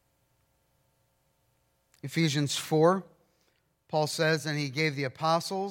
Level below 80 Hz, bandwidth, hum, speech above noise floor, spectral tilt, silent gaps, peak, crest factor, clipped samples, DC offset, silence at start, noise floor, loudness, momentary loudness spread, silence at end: -76 dBFS; 16.5 kHz; none; 44 dB; -5 dB/octave; none; -10 dBFS; 22 dB; under 0.1%; under 0.1%; 2.05 s; -72 dBFS; -28 LUFS; 8 LU; 0 s